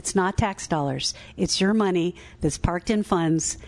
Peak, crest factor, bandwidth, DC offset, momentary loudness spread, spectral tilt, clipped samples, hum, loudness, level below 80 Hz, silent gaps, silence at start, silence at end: -6 dBFS; 18 dB; 12 kHz; under 0.1%; 7 LU; -4.5 dB/octave; under 0.1%; none; -24 LUFS; -40 dBFS; none; 0.05 s; 0 s